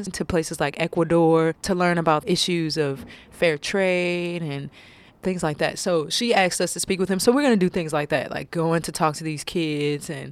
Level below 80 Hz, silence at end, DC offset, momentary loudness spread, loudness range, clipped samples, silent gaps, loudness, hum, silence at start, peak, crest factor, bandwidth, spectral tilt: -52 dBFS; 0 s; under 0.1%; 10 LU; 3 LU; under 0.1%; none; -23 LUFS; none; 0 s; -6 dBFS; 18 dB; 15.5 kHz; -4.5 dB/octave